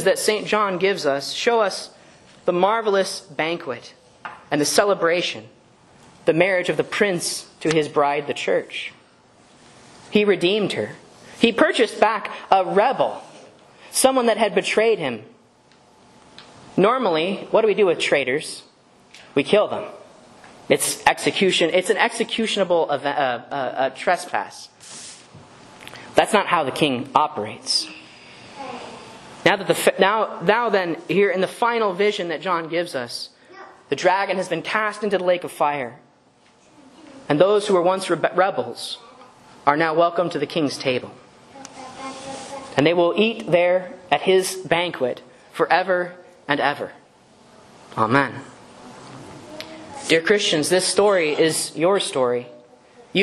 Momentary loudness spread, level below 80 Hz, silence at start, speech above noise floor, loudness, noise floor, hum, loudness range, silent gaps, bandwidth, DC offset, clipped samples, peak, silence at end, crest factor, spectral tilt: 18 LU; -64 dBFS; 0 s; 36 dB; -20 LUFS; -56 dBFS; none; 4 LU; none; 12.5 kHz; under 0.1%; under 0.1%; 0 dBFS; 0 s; 22 dB; -3.5 dB/octave